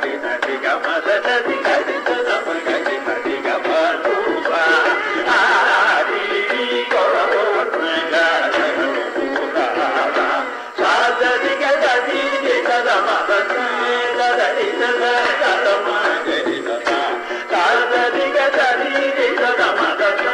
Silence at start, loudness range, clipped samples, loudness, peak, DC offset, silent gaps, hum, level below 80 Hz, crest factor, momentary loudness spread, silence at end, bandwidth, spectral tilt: 0 s; 3 LU; under 0.1%; -17 LUFS; -4 dBFS; under 0.1%; none; none; -64 dBFS; 14 dB; 5 LU; 0 s; 10.5 kHz; -2 dB/octave